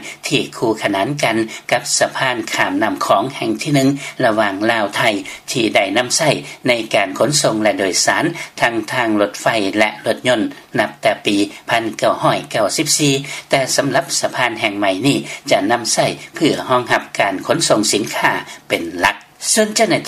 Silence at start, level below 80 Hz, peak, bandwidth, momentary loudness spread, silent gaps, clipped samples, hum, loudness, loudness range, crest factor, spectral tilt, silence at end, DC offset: 0 s; -56 dBFS; 0 dBFS; 15.5 kHz; 5 LU; none; under 0.1%; none; -16 LUFS; 1 LU; 16 dB; -3 dB/octave; 0 s; under 0.1%